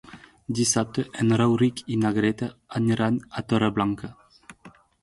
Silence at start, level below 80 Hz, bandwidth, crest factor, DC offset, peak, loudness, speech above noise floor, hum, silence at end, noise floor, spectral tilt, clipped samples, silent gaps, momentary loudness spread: 0.05 s; -56 dBFS; 11.5 kHz; 18 dB; under 0.1%; -8 dBFS; -24 LUFS; 28 dB; none; 0.35 s; -52 dBFS; -5 dB/octave; under 0.1%; none; 10 LU